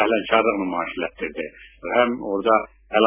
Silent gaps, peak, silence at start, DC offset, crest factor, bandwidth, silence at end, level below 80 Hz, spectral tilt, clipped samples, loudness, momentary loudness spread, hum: none; -2 dBFS; 0 s; under 0.1%; 20 dB; 3.7 kHz; 0 s; -54 dBFS; -8.5 dB/octave; under 0.1%; -22 LUFS; 12 LU; none